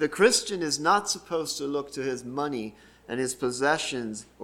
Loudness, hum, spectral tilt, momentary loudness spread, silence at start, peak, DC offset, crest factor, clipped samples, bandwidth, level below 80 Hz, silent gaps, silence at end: -27 LUFS; none; -2.5 dB/octave; 13 LU; 0 s; -6 dBFS; under 0.1%; 22 dB; under 0.1%; 16.5 kHz; -62 dBFS; none; 0 s